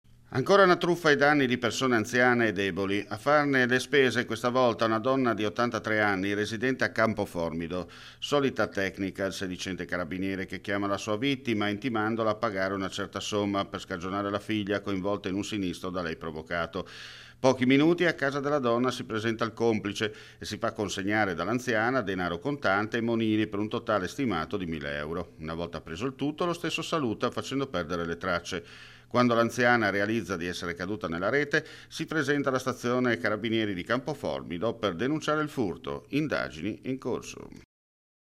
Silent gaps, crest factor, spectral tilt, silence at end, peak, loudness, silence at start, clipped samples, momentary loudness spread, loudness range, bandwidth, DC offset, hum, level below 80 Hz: none; 20 dB; -5 dB/octave; 0.8 s; -8 dBFS; -28 LUFS; 0.3 s; under 0.1%; 11 LU; 6 LU; 15.5 kHz; under 0.1%; none; -58 dBFS